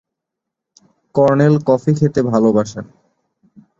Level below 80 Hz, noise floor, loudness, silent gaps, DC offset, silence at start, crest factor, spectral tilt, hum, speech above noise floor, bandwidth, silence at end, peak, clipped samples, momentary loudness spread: -52 dBFS; -81 dBFS; -15 LUFS; none; under 0.1%; 1.15 s; 16 dB; -8 dB/octave; none; 67 dB; 7.6 kHz; 0.95 s; -2 dBFS; under 0.1%; 10 LU